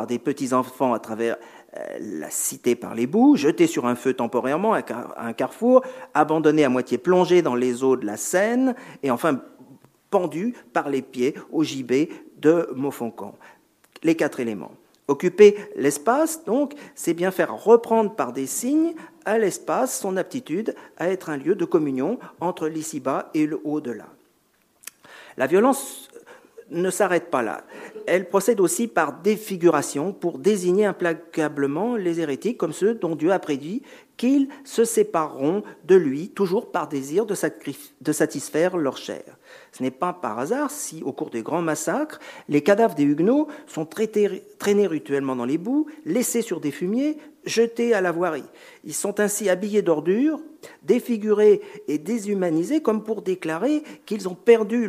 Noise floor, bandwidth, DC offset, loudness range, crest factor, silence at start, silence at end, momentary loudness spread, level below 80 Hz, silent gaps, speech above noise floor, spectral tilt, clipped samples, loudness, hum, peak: -64 dBFS; 15.5 kHz; under 0.1%; 5 LU; 20 dB; 0 s; 0 s; 12 LU; -76 dBFS; none; 42 dB; -5 dB/octave; under 0.1%; -23 LUFS; none; -2 dBFS